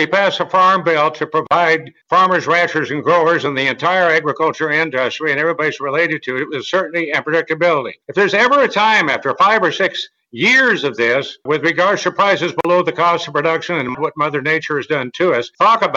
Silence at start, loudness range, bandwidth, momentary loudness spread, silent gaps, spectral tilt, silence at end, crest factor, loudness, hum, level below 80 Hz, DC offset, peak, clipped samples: 0 s; 3 LU; 7.8 kHz; 7 LU; none; -4.5 dB/octave; 0 s; 12 dB; -15 LUFS; none; -64 dBFS; under 0.1%; -2 dBFS; under 0.1%